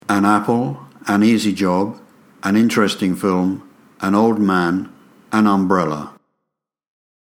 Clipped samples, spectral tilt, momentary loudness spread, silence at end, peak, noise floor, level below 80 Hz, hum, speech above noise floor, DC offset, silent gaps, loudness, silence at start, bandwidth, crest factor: under 0.1%; -6 dB/octave; 11 LU; 1.25 s; 0 dBFS; -79 dBFS; -62 dBFS; none; 63 dB; under 0.1%; none; -17 LUFS; 0.1 s; 16.5 kHz; 18 dB